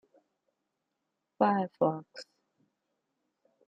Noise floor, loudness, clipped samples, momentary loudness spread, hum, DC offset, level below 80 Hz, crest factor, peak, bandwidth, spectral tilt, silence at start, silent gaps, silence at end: -84 dBFS; -30 LUFS; under 0.1%; 21 LU; none; under 0.1%; -84 dBFS; 24 dB; -12 dBFS; 8.6 kHz; -7.5 dB/octave; 1.4 s; none; 1.45 s